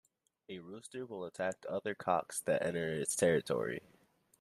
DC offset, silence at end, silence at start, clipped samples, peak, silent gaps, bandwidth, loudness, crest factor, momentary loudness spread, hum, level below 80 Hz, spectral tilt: under 0.1%; 0.6 s; 0.5 s; under 0.1%; -18 dBFS; none; 14 kHz; -36 LUFS; 20 dB; 16 LU; none; -74 dBFS; -4 dB/octave